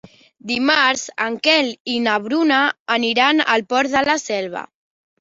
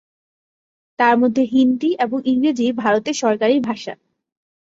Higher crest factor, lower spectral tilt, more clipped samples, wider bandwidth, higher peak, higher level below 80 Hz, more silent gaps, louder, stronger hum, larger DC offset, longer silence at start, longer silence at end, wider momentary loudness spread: about the same, 18 dB vs 18 dB; second, -2 dB/octave vs -4.5 dB/octave; neither; about the same, 7.8 kHz vs 7.8 kHz; about the same, 0 dBFS vs -2 dBFS; about the same, -62 dBFS vs -64 dBFS; first, 1.80-1.85 s, 2.79-2.86 s vs none; about the same, -17 LUFS vs -18 LUFS; neither; neither; second, 0.45 s vs 1 s; second, 0.6 s vs 0.75 s; first, 9 LU vs 5 LU